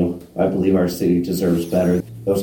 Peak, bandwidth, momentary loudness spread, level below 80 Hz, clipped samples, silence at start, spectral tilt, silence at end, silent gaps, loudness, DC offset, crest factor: -4 dBFS; 17 kHz; 4 LU; -46 dBFS; under 0.1%; 0 s; -7.5 dB/octave; 0 s; none; -19 LUFS; under 0.1%; 14 dB